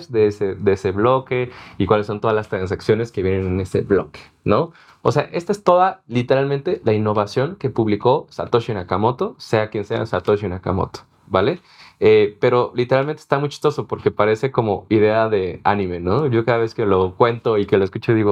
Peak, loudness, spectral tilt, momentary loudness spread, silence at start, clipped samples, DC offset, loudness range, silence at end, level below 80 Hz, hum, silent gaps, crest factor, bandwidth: 0 dBFS; -19 LUFS; -7.5 dB/octave; 7 LU; 0 s; under 0.1%; under 0.1%; 3 LU; 0 s; -54 dBFS; none; none; 18 dB; 10 kHz